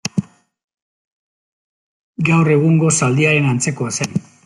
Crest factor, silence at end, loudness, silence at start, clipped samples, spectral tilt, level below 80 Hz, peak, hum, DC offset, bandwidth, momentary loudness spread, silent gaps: 16 dB; 0.25 s; -15 LUFS; 0.05 s; under 0.1%; -5 dB/octave; -56 dBFS; -2 dBFS; none; under 0.1%; 11.5 kHz; 10 LU; 0.64-0.68 s, 0.82-2.14 s